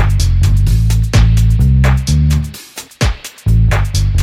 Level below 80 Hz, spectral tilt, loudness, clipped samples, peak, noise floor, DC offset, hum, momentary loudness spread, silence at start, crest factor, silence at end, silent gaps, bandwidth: -14 dBFS; -6 dB/octave; -13 LUFS; under 0.1%; 0 dBFS; -32 dBFS; under 0.1%; none; 8 LU; 0 s; 10 dB; 0 s; none; 16 kHz